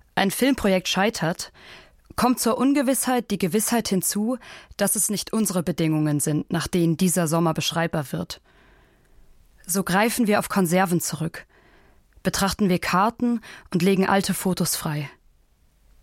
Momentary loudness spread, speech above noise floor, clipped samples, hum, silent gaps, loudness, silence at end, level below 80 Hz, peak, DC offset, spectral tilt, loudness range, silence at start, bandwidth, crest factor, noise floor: 10 LU; 37 dB; under 0.1%; none; none; -23 LUFS; 0.95 s; -50 dBFS; -4 dBFS; under 0.1%; -4.5 dB/octave; 2 LU; 0.15 s; 16.5 kHz; 18 dB; -60 dBFS